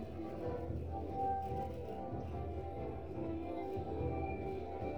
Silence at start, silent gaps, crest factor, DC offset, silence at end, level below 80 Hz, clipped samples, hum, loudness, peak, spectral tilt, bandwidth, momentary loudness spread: 0 s; none; 14 dB; 0.2%; 0 s; -52 dBFS; under 0.1%; none; -42 LUFS; -26 dBFS; -9.5 dB/octave; 8.4 kHz; 5 LU